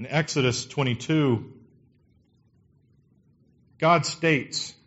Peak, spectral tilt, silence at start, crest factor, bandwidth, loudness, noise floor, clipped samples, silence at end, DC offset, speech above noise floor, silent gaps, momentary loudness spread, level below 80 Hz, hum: -8 dBFS; -4.5 dB/octave; 0 s; 20 dB; 8 kHz; -24 LUFS; -63 dBFS; under 0.1%; 0.15 s; under 0.1%; 38 dB; none; 7 LU; -62 dBFS; none